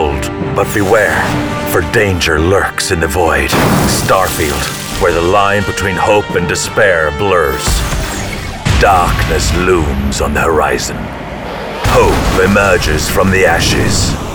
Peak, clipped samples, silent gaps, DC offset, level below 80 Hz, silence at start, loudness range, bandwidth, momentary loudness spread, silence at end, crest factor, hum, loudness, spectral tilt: 0 dBFS; under 0.1%; none; under 0.1%; -22 dBFS; 0 s; 1 LU; over 20 kHz; 8 LU; 0 s; 12 dB; none; -12 LUFS; -4.5 dB/octave